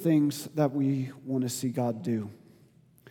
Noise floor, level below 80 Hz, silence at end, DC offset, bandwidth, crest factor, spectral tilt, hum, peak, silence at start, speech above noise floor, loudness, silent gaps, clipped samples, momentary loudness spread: -60 dBFS; -78 dBFS; 0.75 s; under 0.1%; 18.5 kHz; 18 dB; -6.5 dB/octave; none; -12 dBFS; 0 s; 31 dB; -30 LUFS; none; under 0.1%; 7 LU